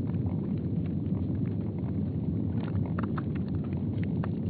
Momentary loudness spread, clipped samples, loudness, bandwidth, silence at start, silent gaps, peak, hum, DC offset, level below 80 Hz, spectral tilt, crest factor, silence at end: 1 LU; under 0.1%; -31 LUFS; 4.6 kHz; 0 s; none; -18 dBFS; none; under 0.1%; -48 dBFS; -10 dB/octave; 12 dB; 0 s